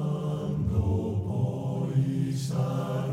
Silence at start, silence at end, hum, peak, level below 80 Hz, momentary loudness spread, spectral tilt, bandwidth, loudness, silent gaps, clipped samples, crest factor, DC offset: 0 s; 0 s; none; -14 dBFS; -44 dBFS; 3 LU; -8 dB/octave; 13.5 kHz; -29 LUFS; none; under 0.1%; 14 dB; under 0.1%